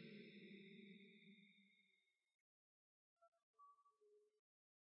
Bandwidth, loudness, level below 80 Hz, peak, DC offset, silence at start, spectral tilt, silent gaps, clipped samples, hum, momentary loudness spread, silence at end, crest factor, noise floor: 5.4 kHz; -63 LUFS; under -90 dBFS; -50 dBFS; under 0.1%; 0 s; -4 dB/octave; 2.34-3.17 s, 3.28-3.32 s, 3.43-3.54 s; under 0.1%; none; 7 LU; 0.5 s; 18 dB; -86 dBFS